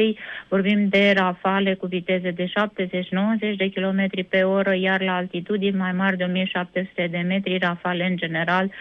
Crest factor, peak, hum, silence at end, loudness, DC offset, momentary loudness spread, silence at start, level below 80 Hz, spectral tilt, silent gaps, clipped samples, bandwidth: 16 dB; -6 dBFS; none; 0 s; -22 LUFS; under 0.1%; 6 LU; 0 s; -66 dBFS; -8 dB/octave; none; under 0.1%; 6 kHz